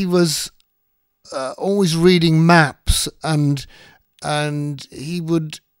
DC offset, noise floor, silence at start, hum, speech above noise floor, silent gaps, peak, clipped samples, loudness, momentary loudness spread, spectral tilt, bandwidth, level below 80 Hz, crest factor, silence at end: under 0.1%; -69 dBFS; 0 s; none; 51 dB; none; 0 dBFS; under 0.1%; -18 LUFS; 16 LU; -5 dB/octave; 16 kHz; -34 dBFS; 18 dB; 0.25 s